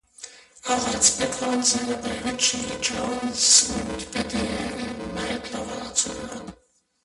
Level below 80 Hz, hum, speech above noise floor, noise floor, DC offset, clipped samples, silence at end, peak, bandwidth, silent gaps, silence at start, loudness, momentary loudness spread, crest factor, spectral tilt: -48 dBFS; none; 39 dB; -63 dBFS; under 0.1%; under 0.1%; 0.5 s; -2 dBFS; 11.5 kHz; none; 0.2 s; -23 LUFS; 18 LU; 24 dB; -1.5 dB/octave